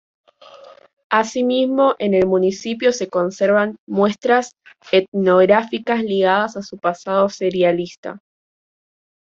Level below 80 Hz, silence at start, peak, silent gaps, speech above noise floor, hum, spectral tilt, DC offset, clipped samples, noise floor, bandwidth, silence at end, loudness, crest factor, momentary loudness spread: -60 dBFS; 0.55 s; -2 dBFS; 0.93-0.97 s, 1.04-1.10 s, 3.79-3.87 s, 5.08-5.12 s, 7.98-8.03 s; 26 dB; none; -5.5 dB/octave; under 0.1%; under 0.1%; -43 dBFS; 7.6 kHz; 1.15 s; -18 LUFS; 16 dB; 8 LU